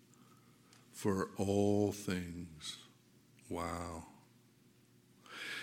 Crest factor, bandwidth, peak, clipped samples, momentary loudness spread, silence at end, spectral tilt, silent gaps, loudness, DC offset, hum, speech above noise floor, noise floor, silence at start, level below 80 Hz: 20 dB; 17 kHz; -20 dBFS; under 0.1%; 19 LU; 0 s; -5.5 dB/octave; none; -38 LUFS; under 0.1%; none; 30 dB; -67 dBFS; 0.95 s; -66 dBFS